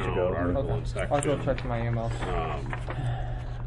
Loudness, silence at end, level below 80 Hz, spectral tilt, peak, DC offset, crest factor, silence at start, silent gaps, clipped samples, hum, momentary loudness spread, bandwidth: -30 LUFS; 0 s; -36 dBFS; -6.5 dB/octave; -12 dBFS; under 0.1%; 16 dB; 0 s; none; under 0.1%; none; 7 LU; 11.5 kHz